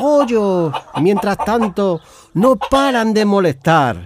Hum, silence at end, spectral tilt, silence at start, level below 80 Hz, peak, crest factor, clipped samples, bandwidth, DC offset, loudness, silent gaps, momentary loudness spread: none; 0 s; -6 dB/octave; 0 s; -44 dBFS; -2 dBFS; 14 dB; under 0.1%; 15.5 kHz; under 0.1%; -15 LUFS; none; 5 LU